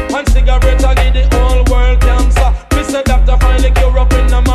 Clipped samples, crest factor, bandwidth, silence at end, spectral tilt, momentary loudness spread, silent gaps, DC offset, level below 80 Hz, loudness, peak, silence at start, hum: under 0.1%; 8 dB; 12.5 kHz; 0 s; -5.5 dB/octave; 3 LU; none; under 0.1%; -8 dBFS; -12 LUFS; 0 dBFS; 0 s; none